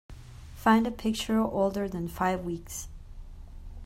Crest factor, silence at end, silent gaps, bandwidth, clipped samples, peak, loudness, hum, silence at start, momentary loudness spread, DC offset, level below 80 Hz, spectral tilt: 22 dB; 0 s; none; 16 kHz; under 0.1%; -8 dBFS; -29 LUFS; none; 0.1 s; 25 LU; under 0.1%; -46 dBFS; -5 dB/octave